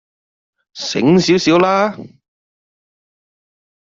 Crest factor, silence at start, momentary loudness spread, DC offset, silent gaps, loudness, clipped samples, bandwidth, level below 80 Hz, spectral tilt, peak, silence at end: 16 dB; 0.75 s; 12 LU; under 0.1%; none; -14 LUFS; under 0.1%; 7.6 kHz; -56 dBFS; -5.5 dB/octave; -2 dBFS; 1.9 s